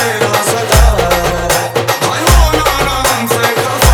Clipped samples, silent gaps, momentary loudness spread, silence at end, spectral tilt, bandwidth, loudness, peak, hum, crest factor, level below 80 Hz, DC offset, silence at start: under 0.1%; none; 4 LU; 0 s; -3.5 dB/octave; 20 kHz; -11 LUFS; 0 dBFS; none; 10 dB; -16 dBFS; under 0.1%; 0 s